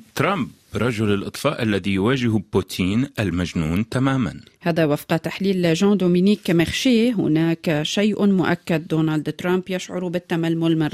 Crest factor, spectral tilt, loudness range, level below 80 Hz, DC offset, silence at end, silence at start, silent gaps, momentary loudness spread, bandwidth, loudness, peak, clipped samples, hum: 14 dB; -6 dB/octave; 3 LU; -50 dBFS; under 0.1%; 0 s; 0.15 s; none; 6 LU; 15 kHz; -21 LUFS; -6 dBFS; under 0.1%; none